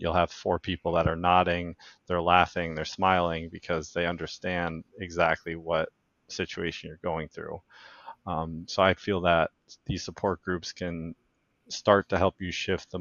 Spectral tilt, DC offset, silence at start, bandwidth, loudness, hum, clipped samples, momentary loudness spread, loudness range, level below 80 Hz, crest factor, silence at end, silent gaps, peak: -5 dB/octave; under 0.1%; 0 s; 7.2 kHz; -28 LUFS; none; under 0.1%; 15 LU; 6 LU; -50 dBFS; 24 dB; 0 s; none; -4 dBFS